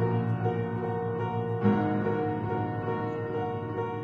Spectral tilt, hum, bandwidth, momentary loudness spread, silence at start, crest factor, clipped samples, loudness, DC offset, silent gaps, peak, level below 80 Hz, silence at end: -10 dB/octave; none; 5 kHz; 6 LU; 0 s; 18 dB; under 0.1%; -30 LUFS; under 0.1%; none; -12 dBFS; -60 dBFS; 0 s